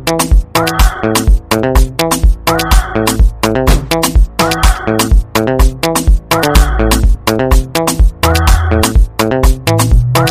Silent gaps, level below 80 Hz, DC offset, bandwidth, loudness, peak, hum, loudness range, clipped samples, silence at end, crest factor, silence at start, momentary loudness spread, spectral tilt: none; -12 dBFS; under 0.1%; 16 kHz; -12 LUFS; 0 dBFS; none; 1 LU; 0.2%; 0 s; 10 dB; 0 s; 2 LU; -4.5 dB/octave